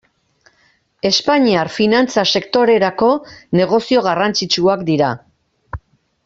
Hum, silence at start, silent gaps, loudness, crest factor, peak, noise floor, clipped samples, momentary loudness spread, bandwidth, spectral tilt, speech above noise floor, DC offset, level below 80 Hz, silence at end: none; 1.05 s; none; -15 LUFS; 16 dB; -2 dBFS; -58 dBFS; under 0.1%; 10 LU; 7.8 kHz; -4.5 dB/octave; 43 dB; under 0.1%; -48 dBFS; 0.5 s